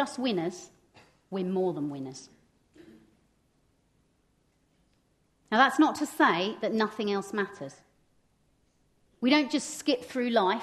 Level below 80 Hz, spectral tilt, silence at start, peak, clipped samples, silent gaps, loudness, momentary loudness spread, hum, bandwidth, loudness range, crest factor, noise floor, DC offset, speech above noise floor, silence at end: -74 dBFS; -4.5 dB/octave; 0 s; -6 dBFS; under 0.1%; none; -28 LUFS; 15 LU; none; 13 kHz; 10 LU; 24 dB; -70 dBFS; under 0.1%; 42 dB; 0 s